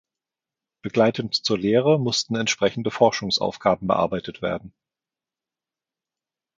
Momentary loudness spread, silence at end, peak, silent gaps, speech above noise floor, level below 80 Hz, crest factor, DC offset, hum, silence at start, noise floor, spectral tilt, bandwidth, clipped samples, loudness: 9 LU; 1.9 s; -2 dBFS; none; 68 dB; -58 dBFS; 22 dB; under 0.1%; none; 0.85 s; -90 dBFS; -4.5 dB/octave; 9.2 kHz; under 0.1%; -22 LUFS